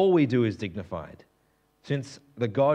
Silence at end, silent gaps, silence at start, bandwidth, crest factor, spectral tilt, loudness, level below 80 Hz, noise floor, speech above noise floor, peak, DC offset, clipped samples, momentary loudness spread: 0 s; none; 0 s; 9.4 kHz; 16 dB; -8 dB/octave; -28 LUFS; -64 dBFS; -68 dBFS; 42 dB; -12 dBFS; under 0.1%; under 0.1%; 17 LU